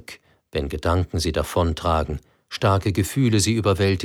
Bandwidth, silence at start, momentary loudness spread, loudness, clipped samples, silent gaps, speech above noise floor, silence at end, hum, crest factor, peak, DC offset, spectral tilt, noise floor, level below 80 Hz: 16.5 kHz; 0.1 s; 11 LU; -22 LUFS; under 0.1%; none; 24 dB; 0 s; none; 16 dB; -6 dBFS; under 0.1%; -5.5 dB/octave; -45 dBFS; -36 dBFS